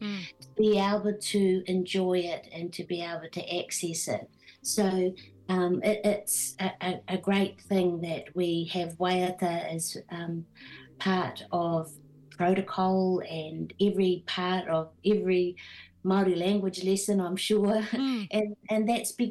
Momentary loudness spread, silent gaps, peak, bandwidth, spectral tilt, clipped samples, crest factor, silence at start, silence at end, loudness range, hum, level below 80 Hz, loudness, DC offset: 11 LU; none; -14 dBFS; 12.5 kHz; -5 dB/octave; under 0.1%; 16 dB; 0 s; 0 s; 4 LU; none; -68 dBFS; -29 LUFS; under 0.1%